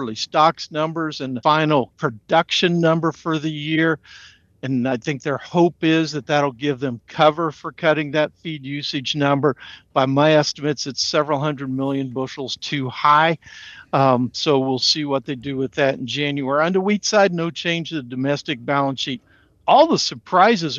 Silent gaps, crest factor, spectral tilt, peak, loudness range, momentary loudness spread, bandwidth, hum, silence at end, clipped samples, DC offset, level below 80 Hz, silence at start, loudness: none; 16 dB; -5 dB/octave; -2 dBFS; 2 LU; 10 LU; 7.8 kHz; none; 0 s; under 0.1%; under 0.1%; -62 dBFS; 0 s; -20 LUFS